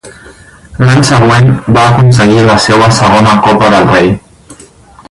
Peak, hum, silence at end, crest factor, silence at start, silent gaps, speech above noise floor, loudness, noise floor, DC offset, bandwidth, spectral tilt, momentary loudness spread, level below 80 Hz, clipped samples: 0 dBFS; none; 0.6 s; 6 dB; 0.05 s; none; 30 dB; -6 LUFS; -36 dBFS; under 0.1%; 11.5 kHz; -5.5 dB/octave; 4 LU; -32 dBFS; 0.7%